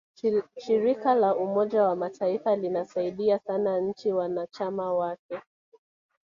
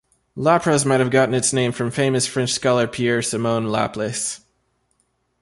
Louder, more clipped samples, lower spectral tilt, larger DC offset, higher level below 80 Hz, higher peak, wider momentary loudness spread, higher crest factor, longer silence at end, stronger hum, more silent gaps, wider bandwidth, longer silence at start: second, -27 LUFS vs -19 LUFS; neither; first, -7.5 dB/octave vs -4.5 dB/octave; neither; second, -72 dBFS vs -56 dBFS; second, -10 dBFS vs -4 dBFS; about the same, 8 LU vs 7 LU; about the same, 16 dB vs 18 dB; second, 0.9 s vs 1.05 s; neither; first, 5.19-5.29 s vs none; second, 7.4 kHz vs 11.5 kHz; about the same, 0.25 s vs 0.35 s